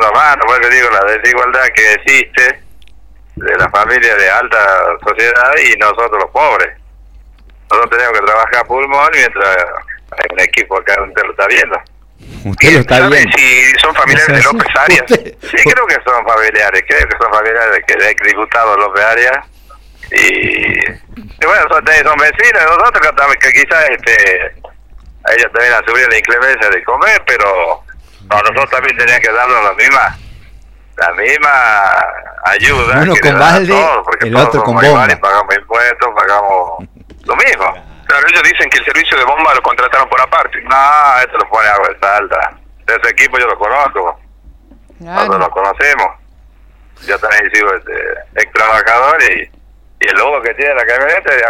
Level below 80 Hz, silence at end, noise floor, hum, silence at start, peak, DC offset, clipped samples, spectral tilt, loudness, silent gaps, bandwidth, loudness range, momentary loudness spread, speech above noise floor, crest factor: -36 dBFS; 0 s; -40 dBFS; none; 0 s; 0 dBFS; under 0.1%; under 0.1%; -3.5 dB/octave; -8 LUFS; none; 18 kHz; 5 LU; 8 LU; 31 dB; 10 dB